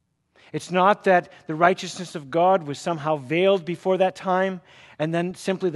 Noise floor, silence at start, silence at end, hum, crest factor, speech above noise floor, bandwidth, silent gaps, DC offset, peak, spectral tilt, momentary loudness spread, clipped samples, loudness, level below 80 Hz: -57 dBFS; 0.55 s; 0 s; none; 20 dB; 35 dB; 12 kHz; none; under 0.1%; -2 dBFS; -5.5 dB/octave; 12 LU; under 0.1%; -22 LUFS; -70 dBFS